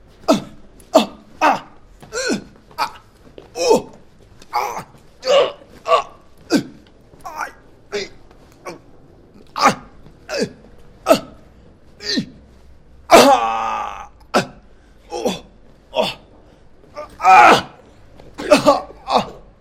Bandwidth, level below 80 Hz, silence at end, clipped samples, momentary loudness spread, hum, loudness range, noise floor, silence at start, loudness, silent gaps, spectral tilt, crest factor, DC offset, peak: 16.5 kHz; -48 dBFS; 0.25 s; under 0.1%; 24 LU; none; 9 LU; -46 dBFS; 0.3 s; -17 LUFS; none; -3.5 dB/octave; 20 dB; under 0.1%; 0 dBFS